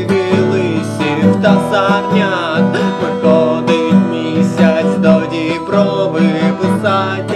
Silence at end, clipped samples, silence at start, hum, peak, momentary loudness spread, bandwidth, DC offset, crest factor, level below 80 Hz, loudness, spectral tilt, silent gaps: 0 s; under 0.1%; 0 s; none; 0 dBFS; 4 LU; 11 kHz; under 0.1%; 12 dB; -54 dBFS; -13 LUFS; -7 dB/octave; none